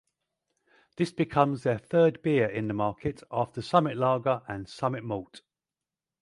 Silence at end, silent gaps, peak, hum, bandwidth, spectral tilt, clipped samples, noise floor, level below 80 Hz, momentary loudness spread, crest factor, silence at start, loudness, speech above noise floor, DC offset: 0.85 s; none; -6 dBFS; none; 11.5 kHz; -7.5 dB/octave; under 0.1%; under -90 dBFS; -60 dBFS; 10 LU; 22 dB; 1 s; -28 LUFS; over 63 dB; under 0.1%